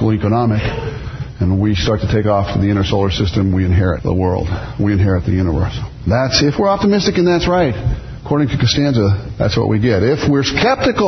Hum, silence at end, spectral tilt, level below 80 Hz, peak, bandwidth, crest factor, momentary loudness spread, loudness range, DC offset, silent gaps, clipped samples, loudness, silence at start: none; 0 s; -6.5 dB/octave; -30 dBFS; 0 dBFS; 6.4 kHz; 14 dB; 7 LU; 2 LU; under 0.1%; none; under 0.1%; -15 LUFS; 0 s